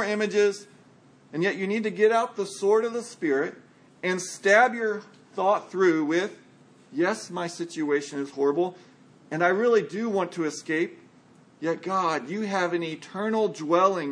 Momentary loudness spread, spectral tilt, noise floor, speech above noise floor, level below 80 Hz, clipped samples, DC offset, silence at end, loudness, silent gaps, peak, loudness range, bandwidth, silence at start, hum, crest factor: 10 LU; -4.5 dB/octave; -55 dBFS; 30 dB; -82 dBFS; under 0.1%; under 0.1%; 0 s; -26 LUFS; none; -6 dBFS; 4 LU; 10.5 kHz; 0 s; none; 20 dB